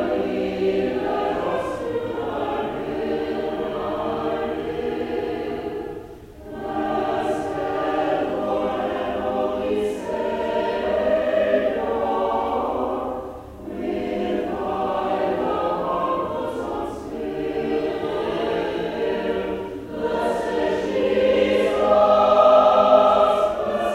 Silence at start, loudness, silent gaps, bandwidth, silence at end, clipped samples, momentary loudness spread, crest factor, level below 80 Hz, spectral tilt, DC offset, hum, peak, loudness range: 0 s; -22 LUFS; none; 14 kHz; 0 s; under 0.1%; 12 LU; 20 dB; -48 dBFS; -6 dB/octave; under 0.1%; none; -2 dBFS; 8 LU